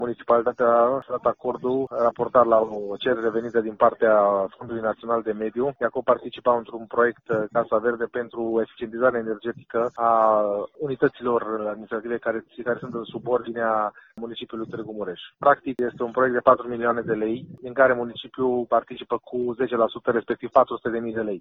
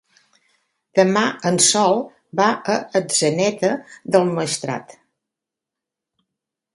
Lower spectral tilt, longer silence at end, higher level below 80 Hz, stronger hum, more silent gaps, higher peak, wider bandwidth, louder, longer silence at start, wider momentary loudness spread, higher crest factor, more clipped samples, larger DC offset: first, -8 dB/octave vs -3.5 dB/octave; second, 0 s vs 1.9 s; about the same, -62 dBFS vs -66 dBFS; neither; neither; about the same, -2 dBFS vs 0 dBFS; second, 4.1 kHz vs 11.5 kHz; second, -24 LUFS vs -19 LUFS; second, 0 s vs 0.95 s; about the same, 11 LU vs 10 LU; about the same, 20 dB vs 20 dB; neither; neither